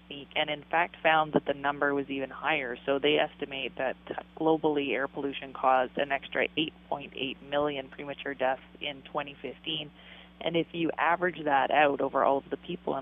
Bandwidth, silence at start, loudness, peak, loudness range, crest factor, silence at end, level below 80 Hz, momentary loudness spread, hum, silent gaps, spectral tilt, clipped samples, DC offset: 3.9 kHz; 0.1 s; -30 LUFS; -10 dBFS; 6 LU; 20 dB; 0 s; -62 dBFS; 12 LU; none; none; -8 dB/octave; under 0.1%; under 0.1%